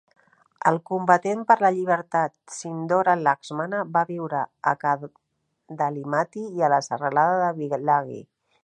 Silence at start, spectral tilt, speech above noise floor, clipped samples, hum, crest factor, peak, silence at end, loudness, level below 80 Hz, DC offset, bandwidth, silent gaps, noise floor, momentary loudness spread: 0.65 s; -6 dB/octave; 47 dB; under 0.1%; none; 20 dB; -4 dBFS; 0.4 s; -23 LUFS; -76 dBFS; under 0.1%; 9.8 kHz; none; -70 dBFS; 9 LU